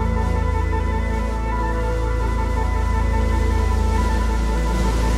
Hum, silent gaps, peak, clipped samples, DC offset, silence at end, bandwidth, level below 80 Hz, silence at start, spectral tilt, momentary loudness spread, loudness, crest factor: none; none; -8 dBFS; under 0.1%; under 0.1%; 0 s; 11.5 kHz; -20 dBFS; 0 s; -6.5 dB/octave; 3 LU; -22 LUFS; 10 dB